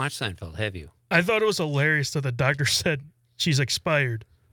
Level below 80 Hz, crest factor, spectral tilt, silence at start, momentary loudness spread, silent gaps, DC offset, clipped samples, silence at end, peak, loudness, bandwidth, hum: -56 dBFS; 20 dB; -4 dB/octave; 0 s; 10 LU; none; under 0.1%; under 0.1%; 0.3 s; -6 dBFS; -24 LUFS; 19.5 kHz; none